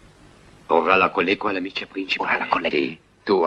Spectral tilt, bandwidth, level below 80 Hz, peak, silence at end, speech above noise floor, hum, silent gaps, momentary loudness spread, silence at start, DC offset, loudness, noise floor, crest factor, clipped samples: -5.5 dB/octave; 9 kHz; -58 dBFS; 0 dBFS; 0 s; 27 dB; none; none; 11 LU; 0.7 s; under 0.1%; -21 LUFS; -49 dBFS; 22 dB; under 0.1%